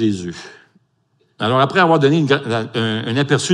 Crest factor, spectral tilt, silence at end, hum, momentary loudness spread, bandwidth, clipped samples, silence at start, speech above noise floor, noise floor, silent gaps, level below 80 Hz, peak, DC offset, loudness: 18 dB; -5.5 dB/octave; 0 s; none; 12 LU; 11.5 kHz; under 0.1%; 0 s; 46 dB; -62 dBFS; none; -64 dBFS; 0 dBFS; under 0.1%; -16 LUFS